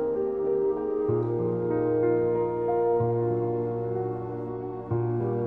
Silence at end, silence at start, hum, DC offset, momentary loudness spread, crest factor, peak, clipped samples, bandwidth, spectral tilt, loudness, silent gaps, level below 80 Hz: 0 s; 0 s; none; under 0.1%; 7 LU; 14 dB; -14 dBFS; under 0.1%; 3 kHz; -12 dB/octave; -27 LUFS; none; -56 dBFS